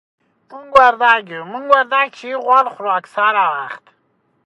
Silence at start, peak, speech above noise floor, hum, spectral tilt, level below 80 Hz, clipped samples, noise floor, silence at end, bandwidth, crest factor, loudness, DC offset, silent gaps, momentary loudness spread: 0.5 s; 0 dBFS; 48 dB; none; -3.5 dB/octave; -58 dBFS; under 0.1%; -63 dBFS; 0.7 s; 11 kHz; 16 dB; -14 LUFS; under 0.1%; none; 15 LU